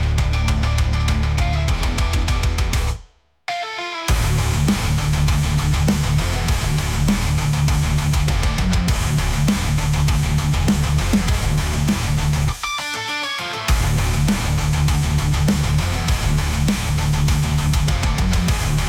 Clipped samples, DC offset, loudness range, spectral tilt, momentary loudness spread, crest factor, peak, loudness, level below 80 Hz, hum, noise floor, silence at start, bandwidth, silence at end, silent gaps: under 0.1%; under 0.1%; 2 LU; -5 dB/octave; 4 LU; 12 dB; -6 dBFS; -19 LUFS; -22 dBFS; none; -46 dBFS; 0 s; 18 kHz; 0 s; none